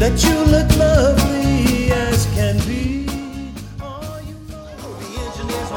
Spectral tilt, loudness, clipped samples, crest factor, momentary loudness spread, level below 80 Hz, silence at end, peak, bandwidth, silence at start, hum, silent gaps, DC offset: -5.5 dB/octave; -17 LUFS; under 0.1%; 18 dB; 19 LU; -24 dBFS; 0 s; 0 dBFS; 19 kHz; 0 s; none; none; under 0.1%